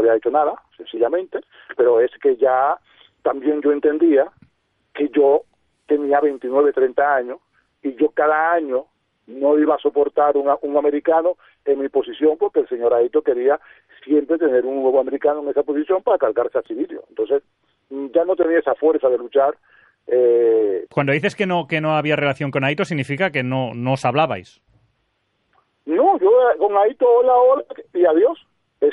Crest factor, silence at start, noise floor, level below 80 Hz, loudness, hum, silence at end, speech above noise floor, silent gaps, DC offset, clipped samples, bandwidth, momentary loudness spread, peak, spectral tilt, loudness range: 14 dB; 0 s; -69 dBFS; -66 dBFS; -18 LUFS; none; 0 s; 51 dB; none; under 0.1%; under 0.1%; 8.6 kHz; 10 LU; -4 dBFS; -7.5 dB/octave; 3 LU